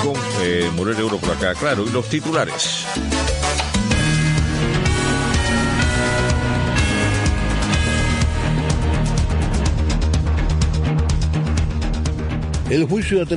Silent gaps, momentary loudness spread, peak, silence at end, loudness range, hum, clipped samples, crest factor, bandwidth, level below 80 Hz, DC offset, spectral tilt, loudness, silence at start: none; 3 LU; -4 dBFS; 0 s; 2 LU; none; under 0.1%; 14 dB; 11 kHz; -24 dBFS; under 0.1%; -5 dB/octave; -19 LUFS; 0 s